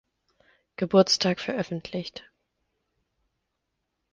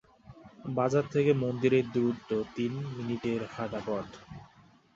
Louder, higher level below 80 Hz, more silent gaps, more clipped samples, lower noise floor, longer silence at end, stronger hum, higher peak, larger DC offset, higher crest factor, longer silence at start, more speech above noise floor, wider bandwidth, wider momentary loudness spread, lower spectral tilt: first, -25 LUFS vs -30 LUFS; about the same, -66 dBFS vs -64 dBFS; neither; neither; first, -80 dBFS vs -60 dBFS; first, 1.95 s vs 0.5 s; neither; first, -6 dBFS vs -12 dBFS; neither; first, 24 dB vs 18 dB; first, 0.8 s vs 0.3 s; first, 55 dB vs 30 dB; first, 9.8 kHz vs 7.8 kHz; first, 21 LU vs 18 LU; second, -4.5 dB/octave vs -7.5 dB/octave